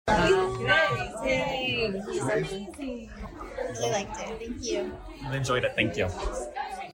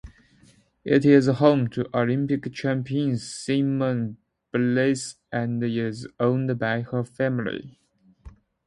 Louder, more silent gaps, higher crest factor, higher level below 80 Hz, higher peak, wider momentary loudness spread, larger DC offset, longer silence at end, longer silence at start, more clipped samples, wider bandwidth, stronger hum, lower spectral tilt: second, -28 LUFS vs -24 LUFS; neither; about the same, 20 dB vs 20 dB; first, -44 dBFS vs -58 dBFS; second, -10 dBFS vs -4 dBFS; about the same, 14 LU vs 12 LU; neither; second, 0 s vs 0.4 s; about the same, 0.05 s vs 0.05 s; neither; first, 16.5 kHz vs 11.5 kHz; neither; second, -4.5 dB/octave vs -7 dB/octave